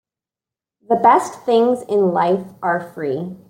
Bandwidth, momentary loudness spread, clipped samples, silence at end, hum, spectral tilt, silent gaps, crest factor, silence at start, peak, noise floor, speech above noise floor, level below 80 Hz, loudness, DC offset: 16.5 kHz; 10 LU; under 0.1%; 0.15 s; none; -6 dB/octave; none; 16 dB; 0.9 s; -2 dBFS; -89 dBFS; 72 dB; -66 dBFS; -18 LUFS; under 0.1%